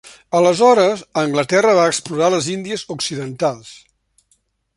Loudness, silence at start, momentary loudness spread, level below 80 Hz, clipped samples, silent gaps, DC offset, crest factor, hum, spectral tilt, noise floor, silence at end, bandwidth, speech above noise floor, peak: -16 LUFS; 0.3 s; 11 LU; -60 dBFS; under 0.1%; none; under 0.1%; 16 dB; none; -4 dB/octave; -63 dBFS; 1 s; 11.5 kHz; 47 dB; -2 dBFS